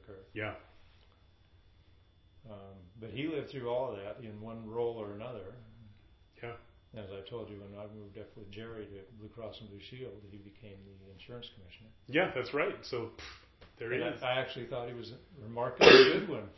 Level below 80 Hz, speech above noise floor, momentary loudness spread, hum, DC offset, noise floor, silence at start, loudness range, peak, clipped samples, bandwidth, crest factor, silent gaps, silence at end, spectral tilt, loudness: -62 dBFS; 30 dB; 20 LU; none; under 0.1%; -63 dBFS; 0.1 s; 14 LU; -4 dBFS; under 0.1%; 6 kHz; 30 dB; none; 0.05 s; -2 dB/octave; -29 LUFS